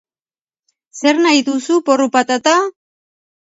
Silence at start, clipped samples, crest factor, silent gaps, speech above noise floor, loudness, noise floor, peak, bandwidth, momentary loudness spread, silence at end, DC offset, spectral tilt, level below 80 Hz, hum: 0.95 s; under 0.1%; 16 dB; none; over 76 dB; -14 LUFS; under -90 dBFS; 0 dBFS; 8 kHz; 4 LU; 0.8 s; under 0.1%; -2 dB/octave; -72 dBFS; none